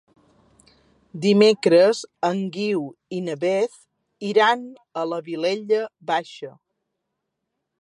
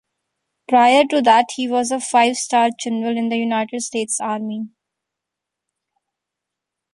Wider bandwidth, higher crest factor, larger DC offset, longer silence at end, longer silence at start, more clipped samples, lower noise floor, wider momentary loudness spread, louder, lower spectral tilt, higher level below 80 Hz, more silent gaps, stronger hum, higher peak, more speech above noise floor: about the same, 11 kHz vs 11.5 kHz; about the same, 20 dB vs 18 dB; neither; second, 1.3 s vs 2.25 s; first, 1.15 s vs 0.7 s; neither; second, -79 dBFS vs -83 dBFS; first, 16 LU vs 11 LU; second, -21 LUFS vs -18 LUFS; first, -5.5 dB/octave vs -2.5 dB/octave; about the same, -74 dBFS vs -70 dBFS; neither; neither; about the same, -4 dBFS vs -2 dBFS; second, 58 dB vs 66 dB